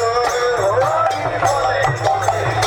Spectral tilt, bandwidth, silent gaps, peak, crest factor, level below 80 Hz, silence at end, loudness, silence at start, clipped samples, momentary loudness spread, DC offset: -4 dB/octave; 18 kHz; none; -4 dBFS; 14 dB; -42 dBFS; 0 s; -17 LUFS; 0 s; under 0.1%; 2 LU; under 0.1%